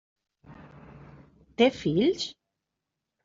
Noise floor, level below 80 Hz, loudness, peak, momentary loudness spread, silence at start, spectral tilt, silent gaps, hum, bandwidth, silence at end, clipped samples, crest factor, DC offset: -85 dBFS; -62 dBFS; -26 LUFS; -8 dBFS; 12 LU; 0.5 s; -4.5 dB/octave; none; none; 7.8 kHz; 0.95 s; under 0.1%; 22 dB; under 0.1%